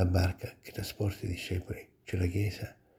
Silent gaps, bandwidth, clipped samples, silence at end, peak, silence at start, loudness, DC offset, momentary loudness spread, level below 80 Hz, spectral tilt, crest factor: none; 16 kHz; under 0.1%; 0.25 s; -14 dBFS; 0 s; -35 LUFS; under 0.1%; 12 LU; -48 dBFS; -6.5 dB/octave; 20 dB